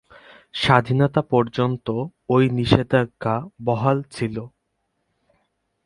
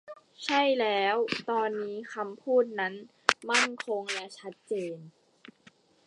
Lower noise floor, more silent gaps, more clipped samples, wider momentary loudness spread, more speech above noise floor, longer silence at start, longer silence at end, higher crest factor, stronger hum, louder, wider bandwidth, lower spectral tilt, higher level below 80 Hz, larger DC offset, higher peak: first, -74 dBFS vs -61 dBFS; neither; neither; about the same, 10 LU vs 12 LU; first, 53 dB vs 31 dB; first, 0.55 s vs 0.05 s; first, 1.35 s vs 0.55 s; second, 22 dB vs 30 dB; neither; first, -21 LUFS vs -29 LUFS; about the same, 11.5 kHz vs 11.5 kHz; first, -7.5 dB/octave vs -2.5 dB/octave; first, -50 dBFS vs -80 dBFS; neither; about the same, 0 dBFS vs 0 dBFS